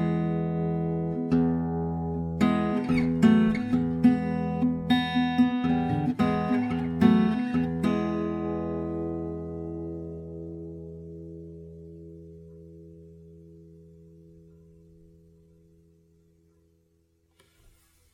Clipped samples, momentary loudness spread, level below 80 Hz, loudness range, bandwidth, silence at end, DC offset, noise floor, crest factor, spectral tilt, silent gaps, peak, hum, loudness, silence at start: under 0.1%; 21 LU; -50 dBFS; 19 LU; 9.8 kHz; 4.3 s; under 0.1%; -68 dBFS; 20 dB; -8 dB/octave; none; -6 dBFS; none; -26 LUFS; 0 s